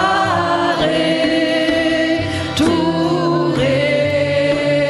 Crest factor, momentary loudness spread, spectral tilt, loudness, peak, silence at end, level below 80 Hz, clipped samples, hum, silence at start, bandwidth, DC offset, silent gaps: 12 dB; 1 LU; -5.5 dB/octave; -16 LUFS; -4 dBFS; 0 s; -44 dBFS; under 0.1%; none; 0 s; 12 kHz; under 0.1%; none